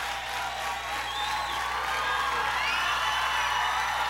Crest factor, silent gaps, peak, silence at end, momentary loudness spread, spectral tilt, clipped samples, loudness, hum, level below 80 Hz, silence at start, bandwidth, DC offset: 14 dB; none; -14 dBFS; 0 s; 5 LU; -0.5 dB/octave; under 0.1%; -28 LUFS; none; -50 dBFS; 0 s; 17.5 kHz; under 0.1%